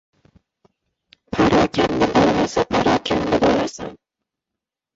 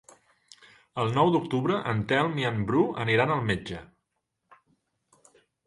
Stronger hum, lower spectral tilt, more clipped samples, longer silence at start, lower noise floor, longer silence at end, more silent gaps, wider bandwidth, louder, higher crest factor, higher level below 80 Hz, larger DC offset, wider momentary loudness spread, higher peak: neither; second, -5.5 dB/octave vs -7 dB/octave; neither; first, 1.3 s vs 0.95 s; first, -85 dBFS vs -80 dBFS; second, 1 s vs 1.8 s; neither; second, 8 kHz vs 11.5 kHz; first, -18 LUFS vs -26 LUFS; about the same, 16 dB vs 20 dB; first, -42 dBFS vs -58 dBFS; neither; first, 11 LU vs 8 LU; first, -4 dBFS vs -8 dBFS